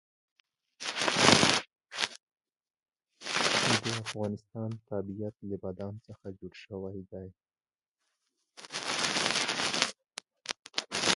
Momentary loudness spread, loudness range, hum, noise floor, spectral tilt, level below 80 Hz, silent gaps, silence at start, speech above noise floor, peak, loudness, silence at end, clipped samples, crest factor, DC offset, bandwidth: 21 LU; 15 LU; none; under -90 dBFS; -2.5 dB/octave; -62 dBFS; 2.23-2.27 s, 7.88-7.92 s; 0.8 s; over 51 dB; -2 dBFS; -29 LUFS; 0 s; under 0.1%; 32 dB; under 0.1%; 11.5 kHz